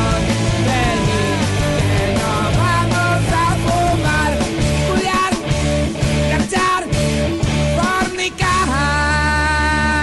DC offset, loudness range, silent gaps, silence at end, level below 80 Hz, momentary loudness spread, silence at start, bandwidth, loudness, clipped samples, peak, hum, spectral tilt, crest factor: under 0.1%; 1 LU; none; 0 s; -26 dBFS; 3 LU; 0 s; 12.5 kHz; -16 LUFS; under 0.1%; -6 dBFS; none; -5 dB/octave; 10 dB